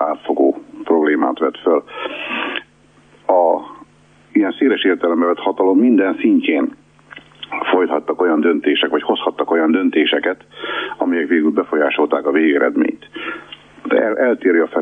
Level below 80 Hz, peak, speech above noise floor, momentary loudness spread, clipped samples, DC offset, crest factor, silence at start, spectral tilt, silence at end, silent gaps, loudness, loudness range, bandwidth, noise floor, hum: -64 dBFS; -2 dBFS; 35 dB; 12 LU; under 0.1%; under 0.1%; 14 dB; 0 s; -6.5 dB/octave; 0 s; none; -16 LUFS; 3 LU; 3.7 kHz; -50 dBFS; 50 Hz at -55 dBFS